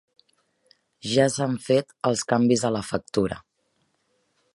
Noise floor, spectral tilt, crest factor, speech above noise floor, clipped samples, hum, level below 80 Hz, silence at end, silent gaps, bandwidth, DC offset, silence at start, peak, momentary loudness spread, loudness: -71 dBFS; -5 dB/octave; 20 dB; 48 dB; under 0.1%; none; -58 dBFS; 1.15 s; none; 11.5 kHz; under 0.1%; 1.05 s; -6 dBFS; 8 LU; -24 LUFS